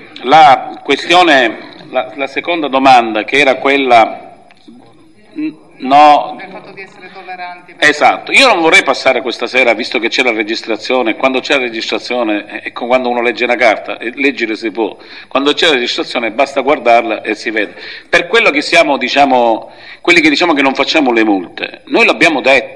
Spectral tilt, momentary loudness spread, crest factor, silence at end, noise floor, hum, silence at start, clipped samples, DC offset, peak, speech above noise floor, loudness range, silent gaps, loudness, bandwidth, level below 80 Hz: -3 dB/octave; 15 LU; 12 dB; 0 s; -43 dBFS; none; 0 s; 0.5%; 0.5%; 0 dBFS; 32 dB; 4 LU; none; -10 LUFS; 12 kHz; -54 dBFS